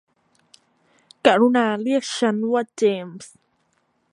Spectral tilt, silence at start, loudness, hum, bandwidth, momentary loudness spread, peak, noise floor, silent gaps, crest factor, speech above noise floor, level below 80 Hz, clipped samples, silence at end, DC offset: -4.5 dB/octave; 1.25 s; -20 LUFS; none; 11.5 kHz; 12 LU; 0 dBFS; -67 dBFS; none; 22 dB; 47 dB; -72 dBFS; under 0.1%; 0.85 s; under 0.1%